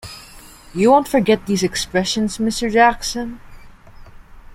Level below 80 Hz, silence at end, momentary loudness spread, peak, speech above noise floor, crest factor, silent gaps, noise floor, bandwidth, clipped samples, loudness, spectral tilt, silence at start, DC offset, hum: -42 dBFS; 0 s; 17 LU; -2 dBFS; 24 dB; 18 dB; none; -41 dBFS; 16.5 kHz; under 0.1%; -17 LUFS; -4 dB/octave; 0.05 s; under 0.1%; none